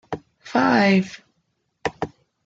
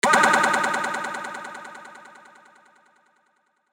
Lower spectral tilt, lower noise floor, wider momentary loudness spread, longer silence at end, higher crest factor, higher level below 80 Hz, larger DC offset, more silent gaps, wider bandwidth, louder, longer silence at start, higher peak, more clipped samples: first, -6 dB/octave vs -2 dB/octave; first, -72 dBFS vs -68 dBFS; second, 17 LU vs 26 LU; second, 0.4 s vs 1.7 s; second, 18 dB vs 24 dB; first, -58 dBFS vs under -90 dBFS; neither; neither; second, 7.6 kHz vs 19.5 kHz; about the same, -20 LUFS vs -21 LUFS; about the same, 0.1 s vs 0.05 s; second, -6 dBFS vs -2 dBFS; neither